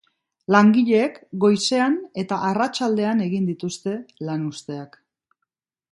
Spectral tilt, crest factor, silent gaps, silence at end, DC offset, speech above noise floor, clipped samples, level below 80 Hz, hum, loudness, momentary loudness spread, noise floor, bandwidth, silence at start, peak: -5.5 dB/octave; 20 dB; none; 1.05 s; under 0.1%; 60 dB; under 0.1%; -68 dBFS; none; -21 LUFS; 14 LU; -81 dBFS; 11.5 kHz; 0.5 s; 0 dBFS